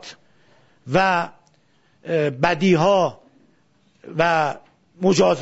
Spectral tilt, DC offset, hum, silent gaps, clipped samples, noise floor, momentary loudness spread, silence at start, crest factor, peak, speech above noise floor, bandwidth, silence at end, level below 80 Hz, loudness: -5.5 dB/octave; under 0.1%; none; none; under 0.1%; -61 dBFS; 15 LU; 0.05 s; 18 dB; -2 dBFS; 42 dB; 8 kHz; 0 s; -56 dBFS; -20 LUFS